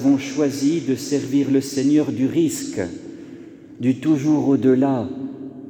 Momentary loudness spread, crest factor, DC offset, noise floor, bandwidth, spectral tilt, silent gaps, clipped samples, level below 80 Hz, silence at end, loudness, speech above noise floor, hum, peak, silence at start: 15 LU; 14 dB; under 0.1%; -40 dBFS; over 20 kHz; -6 dB/octave; none; under 0.1%; -64 dBFS; 0 s; -20 LUFS; 21 dB; none; -6 dBFS; 0 s